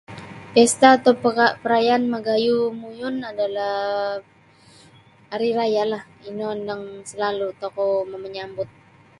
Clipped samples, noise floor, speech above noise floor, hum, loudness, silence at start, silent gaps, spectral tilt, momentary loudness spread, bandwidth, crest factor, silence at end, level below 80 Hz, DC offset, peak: under 0.1%; -51 dBFS; 30 dB; none; -21 LUFS; 0.1 s; none; -3.5 dB/octave; 16 LU; 11.5 kHz; 22 dB; 0.55 s; -64 dBFS; under 0.1%; 0 dBFS